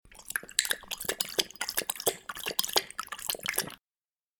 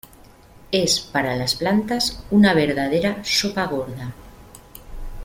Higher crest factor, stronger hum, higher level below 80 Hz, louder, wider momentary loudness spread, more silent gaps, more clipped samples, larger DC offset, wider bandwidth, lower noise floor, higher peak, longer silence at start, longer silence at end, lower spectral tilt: first, 30 dB vs 18 dB; neither; second, -64 dBFS vs -42 dBFS; second, -31 LUFS vs -20 LUFS; second, 8 LU vs 16 LU; neither; neither; neither; first, over 20 kHz vs 16.5 kHz; first, under -90 dBFS vs -47 dBFS; about the same, -4 dBFS vs -4 dBFS; second, 0.05 s vs 0.6 s; first, 0.65 s vs 0 s; second, 0 dB/octave vs -4 dB/octave